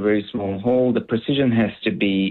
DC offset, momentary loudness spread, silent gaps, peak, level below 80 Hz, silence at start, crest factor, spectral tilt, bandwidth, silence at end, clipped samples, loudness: under 0.1%; 4 LU; none; -8 dBFS; -54 dBFS; 0 s; 12 dB; -9.5 dB/octave; 4.3 kHz; 0 s; under 0.1%; -21 LUFS